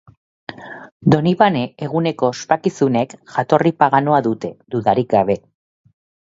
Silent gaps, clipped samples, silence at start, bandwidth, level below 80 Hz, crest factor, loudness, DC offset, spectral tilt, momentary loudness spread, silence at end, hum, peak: 0.92-1.00 s; under 0.1%; 0.5 s; 7.8 kHz; -56 dBFS; 18 dB; -17 LUFS; under 0.1%; -7 dB/octave; 17 LU; 0.9 s; none; 0 dBFS